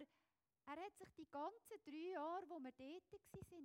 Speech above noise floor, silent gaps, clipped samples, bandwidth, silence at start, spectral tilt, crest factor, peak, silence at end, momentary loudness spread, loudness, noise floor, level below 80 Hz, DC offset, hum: over 36 dB; none; under 0.1%; 16.5 kHz; 0 s; -5.5 dB/octave; 16 dB; -38 dBFS; 0 s; 13 LU; -54 LUFS; under -90 dBFS; -82 dBFS; under 0.1%; none